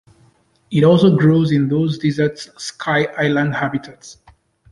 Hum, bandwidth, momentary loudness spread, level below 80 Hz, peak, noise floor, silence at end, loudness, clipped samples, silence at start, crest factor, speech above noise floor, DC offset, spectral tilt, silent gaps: none; 11 kHz; 15 LU; -54 dBFS; -2 dBFS; -55 dBFS; 0.6 s; -16 LUFS; under 0.1%; 0.7 s; 16 dB; 39 dB; under 0.1%; -7 dB/octave; none